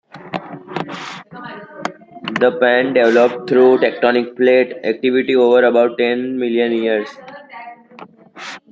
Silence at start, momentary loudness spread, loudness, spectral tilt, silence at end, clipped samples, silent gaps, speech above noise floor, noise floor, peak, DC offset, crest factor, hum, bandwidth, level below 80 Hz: 0.15 s; 21 LU; -15 LUFS; -6 dB/octave; 0.15 s; under 0.1%; none; 26 dB; -40 dBFS; 0 dBFS; under 0.1%; 16 dB; none; 7.4 kHz; -64 dBFS